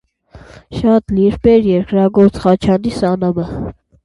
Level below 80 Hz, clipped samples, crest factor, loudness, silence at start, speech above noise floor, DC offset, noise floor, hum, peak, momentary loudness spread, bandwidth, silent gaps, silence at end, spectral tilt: -36 dBFS; under 0.1%; 14 dB; -13 LUFS; 0.35 s; 28 dB; under 0.1%; -41 dBFS; none; 0 dBFS; 12 LU; 11 kHz; none; 0.3 s; -8.5 dB/octave